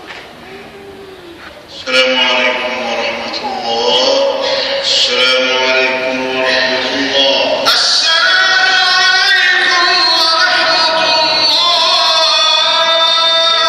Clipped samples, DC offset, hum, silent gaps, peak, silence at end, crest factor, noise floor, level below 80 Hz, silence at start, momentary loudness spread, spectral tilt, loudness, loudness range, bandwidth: under 0.1%; under 0.1%; none; none; 0 dBFS; 0 s; 12 dB; -33 dBFS; -54 dBFS; 0 s; 8 LU; -0.5 dB/octave; -10 LUFS; 5 LU; 14 kHz